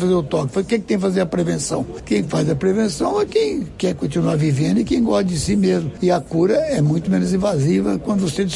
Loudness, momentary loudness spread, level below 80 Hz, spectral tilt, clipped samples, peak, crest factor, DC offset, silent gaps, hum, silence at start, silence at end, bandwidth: -19 LUFS; 4 LU; -42 dBFS; -6.5 dB/octave; under 0.1%; -6 dBFS; 12 dB; under 0.1%; none; none; 0 s; 0 s; 11.5 kHz